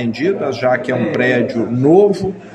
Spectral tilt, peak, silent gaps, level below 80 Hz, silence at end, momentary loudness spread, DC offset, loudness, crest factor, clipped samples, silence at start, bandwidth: -7.5 dB/octave; 0 dBFS; none; -52 dBFS; 0 s; 7 LU; under 0.1%; -15 LUFS; 14 dB; under 0.1%; 0 s; 8.8 kHz